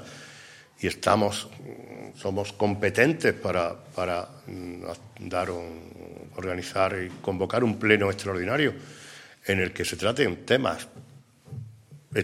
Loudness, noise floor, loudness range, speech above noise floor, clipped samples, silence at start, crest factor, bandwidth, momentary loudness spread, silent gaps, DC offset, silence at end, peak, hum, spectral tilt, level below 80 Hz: -27 LUFS; -52 dBFS; 6 LU; 25 dB; under 0.1%; 0 s; 24 dB; 16 kHz; 21 LU; none; under 0.1%; 0 s; -4 dBFS; none; -5 dB/octave; -60 dBFS